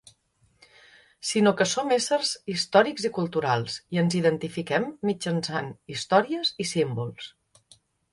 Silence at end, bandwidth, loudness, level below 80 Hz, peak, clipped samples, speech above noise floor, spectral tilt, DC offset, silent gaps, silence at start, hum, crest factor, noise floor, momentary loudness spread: 0.85 s; 11.5 kHz; -25 LUFS; -66 dBFS; -6 dBFS; under 0.1%; 41 dB; -4.5 dB/octave; under 0.1%; none; 1.25 s; none; 22 dB; -66 dBFS; 11 LU